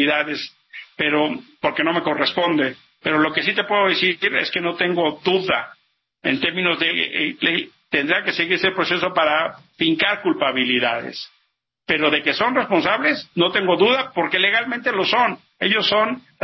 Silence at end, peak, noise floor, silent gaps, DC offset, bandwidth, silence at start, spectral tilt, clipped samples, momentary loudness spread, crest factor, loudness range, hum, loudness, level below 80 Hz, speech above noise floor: 0.25 s; -4 dBFS; -69 dBFS; none; under 0.1%; 6.2 kHz; 0 s; -5.5 dB/octave; under 0.1%; 7 LU; 18 dB; 2 LU; none; -19 LUFS; -60 dBFS; 50 dB